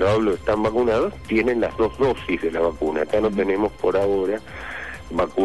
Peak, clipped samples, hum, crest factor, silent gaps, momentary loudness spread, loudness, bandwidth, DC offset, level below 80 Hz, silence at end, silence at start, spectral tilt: -10 dBFS; under 0.1%; none; 12 dB; none; 8 LU; -22 LUFS; 12 kHz; 0.5%; -42 dBFS; 0 s; 0 s; -7 dB/octave